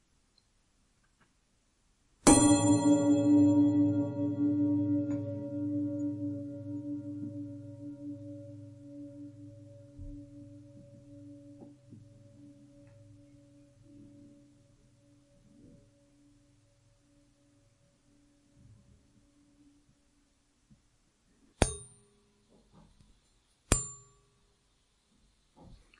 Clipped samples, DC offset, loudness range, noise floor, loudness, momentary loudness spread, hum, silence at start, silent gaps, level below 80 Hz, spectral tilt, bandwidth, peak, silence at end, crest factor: under 0.1%; under 0.1%; 25 LU; -72 dBFS; -29 LUFS; 28 LU; none; 2.25 s; none; -52 dBFS; -5 dB/octave; 11.5 kHz; -4 dBFS; 0.25 s; 30 dB